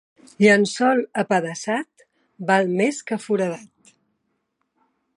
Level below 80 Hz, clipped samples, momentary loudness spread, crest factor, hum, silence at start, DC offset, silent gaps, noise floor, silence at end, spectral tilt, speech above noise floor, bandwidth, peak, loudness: -72 dBFS; under 0.1%; 12 LU; 20 dB; none; 0.4 s; under 0.1%; none; -73 dBFS; 1.5 s; -5 dB/octave; 53 dB; 11.5 kHz; -4 dBFS; -21 LUFS